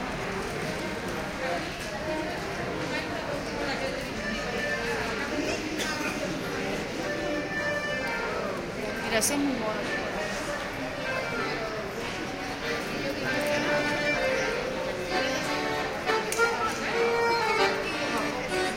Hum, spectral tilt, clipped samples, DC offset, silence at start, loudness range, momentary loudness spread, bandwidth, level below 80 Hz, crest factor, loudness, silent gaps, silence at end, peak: none; -3.5 dB/octave; under 0.1%; under 0.1%; 0 s; 5 LU; 7 LU; 16.5 kHz; -50 dBFS; 20 dB; -29 LUFS; none; 0 s; -10 dBFS